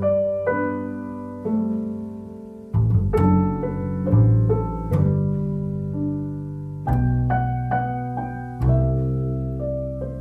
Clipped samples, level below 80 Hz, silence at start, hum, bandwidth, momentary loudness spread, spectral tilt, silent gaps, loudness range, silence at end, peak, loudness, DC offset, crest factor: under 0.1%; -34 dBFS; 0 s; none; 3.2 kHz; 12 LU; -11 dB/octave; none; 4 LU; 0 s; -6 dBFS; -23 LUFS; under 0.1%; 16 dB